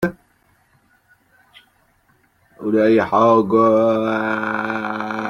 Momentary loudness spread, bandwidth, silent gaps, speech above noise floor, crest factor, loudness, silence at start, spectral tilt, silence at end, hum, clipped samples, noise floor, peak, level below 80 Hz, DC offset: 10 LU; 16.5 kHz; none; 44 dB; 18 dB; -17 LUFS; 0 s; -7.5 dB/octave; 0 s; none; under 0.1%; -59 dBFS; -2 dBFS; -58 dBFS; under 0.1%